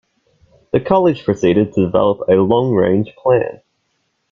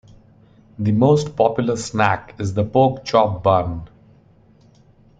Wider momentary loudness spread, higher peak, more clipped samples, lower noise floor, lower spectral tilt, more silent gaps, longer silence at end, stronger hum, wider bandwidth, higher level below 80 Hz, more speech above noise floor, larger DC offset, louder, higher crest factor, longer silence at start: second, 4 LU vs 9 LU; about the same, -2 dBFS vs -2 dBFS; neither; first, -67 dBFS vs -52 dBFS; first, -8 dB/octave vs -6.5 dB/octave; neither; second, 0.8 s vs 1.35 s; neither; second, 7.2 kHz vs 9.2 kHz; about the same, -48 dBFS vs -48 dBFS; first, 53 dB vs 34 dB; neither; first, -15 LUFS vs -19 LUFS; about the same, 14 dB vs 18 dB; about the same, 0.75 s vs 0.8 s